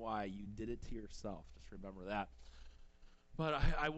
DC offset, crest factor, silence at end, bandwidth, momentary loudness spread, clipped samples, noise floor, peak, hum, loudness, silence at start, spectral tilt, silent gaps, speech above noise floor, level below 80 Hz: under 0.1%; 20 dB; 0 s; 8 kHz; 20 LU; under 0.1%; -61 dBFS; -22 dBFS; none; -44 LUFS; 0 s; -6 dB/octave; none; 20 dB; -46 dBFS